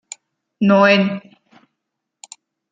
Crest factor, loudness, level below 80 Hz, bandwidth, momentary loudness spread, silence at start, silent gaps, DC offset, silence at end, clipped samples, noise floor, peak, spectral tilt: 18 dB; -15 LUFS; -64 dBFS; 9.4 kHz; 25 LU; 0.6 s; none; under 0.1%; 1.55 s; under 0.1%; -79 dBFS; -2 dBFS; -5.5 dB/octave